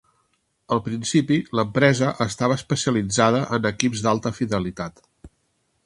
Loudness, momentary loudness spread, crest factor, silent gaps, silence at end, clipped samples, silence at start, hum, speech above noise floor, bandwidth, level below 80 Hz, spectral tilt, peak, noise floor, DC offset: -22 LUFS; 7 LU; 22 dB; none; 0.6 s; under 0.1%; 0.7 s; none; 48 dB; 11.5 kHz; -52 dBFS; -5 dB/octave; 0 dBFS; -69 dBFS; under 0.1%